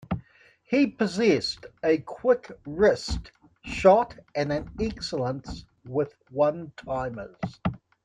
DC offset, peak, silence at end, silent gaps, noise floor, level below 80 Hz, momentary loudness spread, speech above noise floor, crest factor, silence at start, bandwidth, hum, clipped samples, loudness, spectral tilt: under 0.1%; -6 dBFS; 0.25 s; none; -58 dBFS; -46 dBFS; 13 LU; 33 dB; 20 dB; 0.1 s; 10.5 kHz; none; under 0.1%; -26 LUFS; -6 dB/octave